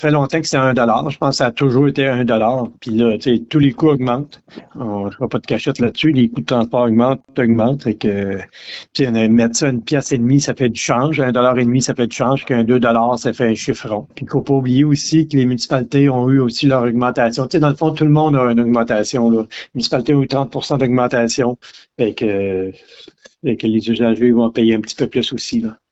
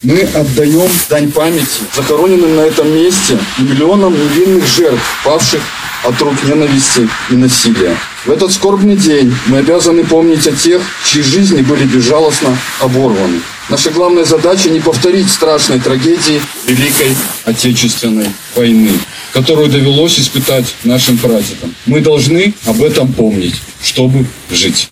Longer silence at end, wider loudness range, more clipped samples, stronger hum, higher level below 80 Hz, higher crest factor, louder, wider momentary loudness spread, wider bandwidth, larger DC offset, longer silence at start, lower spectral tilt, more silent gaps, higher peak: first, 0.2 s vs 0.05 s; about the same, 3 LU vs 2 LU; neither; neither; second, -50 dBFS vs -40 dBFS; about the same, 12 dB vs 10 dB; second, -16 LUFS vs -9 LUFS; first, 8 LU vs 5 LU; second, 8.2 kHz vs 17 kHz; neither; about the same, 0 s vs 0 s; first, -6 dB/octave vs -4 dB/octave; neither; about the same, -2 dBFS vs 0 dBFS